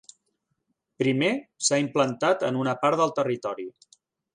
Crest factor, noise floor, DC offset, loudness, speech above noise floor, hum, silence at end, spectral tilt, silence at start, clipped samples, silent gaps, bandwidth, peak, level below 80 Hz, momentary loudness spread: 18 dB; -77 dBFS; under 0.1%; -25 LUFS; 52 dB; none; 0.65 s; -4 dB/octave; 1 s; under 0.1%; none; 11 kHz; -8 dBFS; -74 dBFS; 8 LU